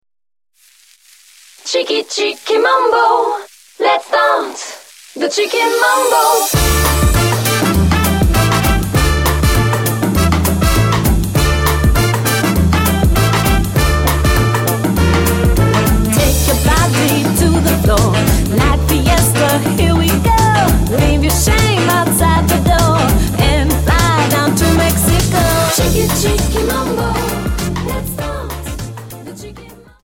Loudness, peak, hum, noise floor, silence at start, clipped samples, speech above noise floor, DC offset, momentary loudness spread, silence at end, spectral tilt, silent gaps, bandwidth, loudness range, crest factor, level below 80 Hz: -13 LUFS; 0 dBFS; none; -50 dBFS; 1.65 s; under 0.1%; 37 dB; under 0.1%; 7 LU; 0.3 s; -4.5 dB/octave; none; 17 kHz; 3 LU; 12 dB; -20 dBFS